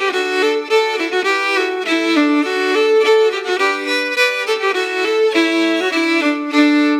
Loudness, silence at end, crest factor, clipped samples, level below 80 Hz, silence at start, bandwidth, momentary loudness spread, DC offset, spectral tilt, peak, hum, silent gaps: -15 LUFS; 0 s; 14 dB; under 0.1%; -90 dBFS; 0 s; 16 kHz; 4 LU; under 0.1%; -1.5 dB/octave; -2 dBFS; none; none